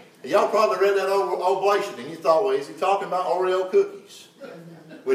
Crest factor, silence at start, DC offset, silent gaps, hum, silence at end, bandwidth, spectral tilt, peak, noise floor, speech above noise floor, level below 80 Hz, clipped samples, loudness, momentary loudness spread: 16 dB; 0.25 s; under 0.1%; none; none; 0 s; 15 kHz; -4 dB/octave; -6 dBFS; -43 dBFS; 21 dB; -84 dBFS; under 0.1%; -22 LUFS; 19 LU